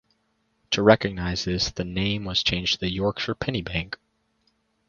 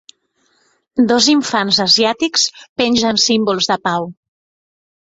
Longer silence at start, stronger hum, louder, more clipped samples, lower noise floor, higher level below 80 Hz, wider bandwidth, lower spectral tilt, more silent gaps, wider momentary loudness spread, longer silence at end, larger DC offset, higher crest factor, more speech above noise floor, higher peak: second, 0.7 s vs 0.95 s; neither; second, -24 LUFS vs -14 LUFS; neither; first, -71 dBFS vs -61 dBFS; first, -44 dBFS vs -56 dBFS; second, 7.2 kHz vs 8 kHz; first, -4.5 dB/octave vs -2.5 dB/octave; second, none vs 2.69-2.76 s; about the same, 10 LU vs 8 LU; about the same, 0.95 s vs 1 s; neither; first, 26 dB vs 16 dB; about the same, 46 dB vs 47 dB; about the same, 0 dBFS vs 0 dBFS